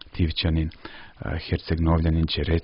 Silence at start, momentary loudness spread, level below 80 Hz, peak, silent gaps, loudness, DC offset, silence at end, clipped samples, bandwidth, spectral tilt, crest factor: 0.05 s; 14 LU; -32 dBFS; -8 dBFS; none; -25 LUFS; under 0.1%; 0 s; under 0.1%; 5.6 kHz; -11 dB/octave; 16 dB